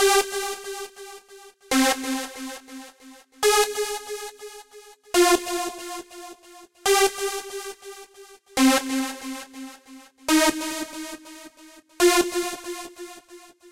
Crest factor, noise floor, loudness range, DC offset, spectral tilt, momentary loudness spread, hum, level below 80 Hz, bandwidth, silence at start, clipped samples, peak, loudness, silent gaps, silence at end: 18 dB; -50 dBFS; 3 LU; under 0.1%; -1 dB/octave; 22 LU; none; -56 dBFS; 16 kHz; 0 s; under 0.1%; -6 dBFS; -23 LUFS; none; 0 s